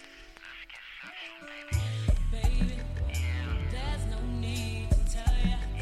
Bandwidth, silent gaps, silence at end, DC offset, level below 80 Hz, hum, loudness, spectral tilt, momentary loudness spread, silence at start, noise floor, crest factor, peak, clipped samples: 12.5 kHz; none; 0 s; under 0.1%; -30 dBFS; none; -32 LUFS; -5.5 dB/octave; 14 LU; 0 s; -49 dBFS; 16 dB; -14 dBFS; under 0.1%